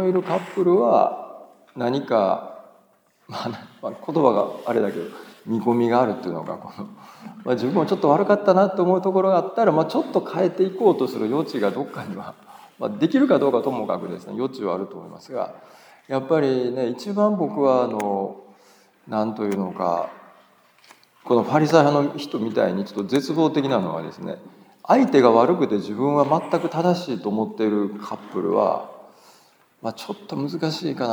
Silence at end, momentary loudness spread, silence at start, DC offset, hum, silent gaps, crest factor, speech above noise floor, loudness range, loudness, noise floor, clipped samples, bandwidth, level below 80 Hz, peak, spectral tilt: 0 s; 16 LU; 0 s; under 0.1%; none; none; 20 dB; 39 dB; 6 LU; -22 LUFS; -60 dBFS; under 0.1%; over 20 kHz; -78 dBFS; -2 dBFS; -7 dB/octave